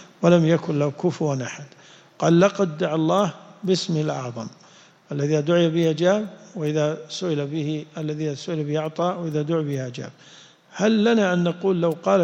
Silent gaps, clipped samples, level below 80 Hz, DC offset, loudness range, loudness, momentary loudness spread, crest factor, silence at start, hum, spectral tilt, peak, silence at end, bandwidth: none; under 0.1%; -66 dBFS; under 0.1%; 4 LU; -22 LUFS; 14 LU; 18 dB; 0 s; none; -6.5 dB/octave; -4 dBFS; 0 s; 8.2 kHz